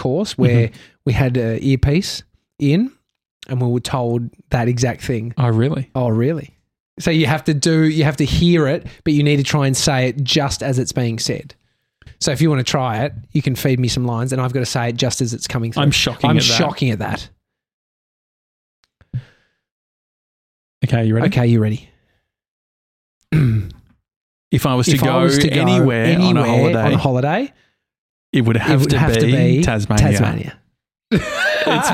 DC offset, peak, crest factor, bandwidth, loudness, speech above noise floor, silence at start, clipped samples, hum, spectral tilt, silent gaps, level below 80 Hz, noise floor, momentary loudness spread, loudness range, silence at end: under 0.1%; -2 dBFS; 14 dB; 16 kHz; -17 LUFS; 51 dB; 0 s; under 0.1%; none; -5.5 dB/octave; 3.31-3.40 s, 6.80-6.97 s, 17.73-18.83 s, 19.71-20.81 s, 22.48-23.21 s, 24.16-24.51 s, 27.98-28.33 s; -38 dBFS; -66 dBFS; 9 LU; 5 LU; 0 s